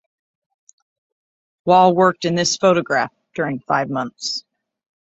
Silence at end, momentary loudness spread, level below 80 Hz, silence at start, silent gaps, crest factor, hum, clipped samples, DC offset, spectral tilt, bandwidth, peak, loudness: 0.65 s; 12 LU; -62 dBFS; 1.65 s; none; 18 dB; none; under 0.1%; under 0.1%; -4.5 dB/octave; 8.2 kHz; -2 dBFS; -18 LUFS